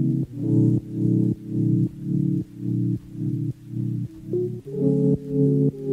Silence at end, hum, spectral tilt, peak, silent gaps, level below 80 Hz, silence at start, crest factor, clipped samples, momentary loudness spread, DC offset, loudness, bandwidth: 0 s; none; -12 dB/octave; -8 dBFS; none; -52 dBFS; 0 s; 14 dB; under 0.1%; 8 LU; under 0.1%; -24 LUFS; 2 kHz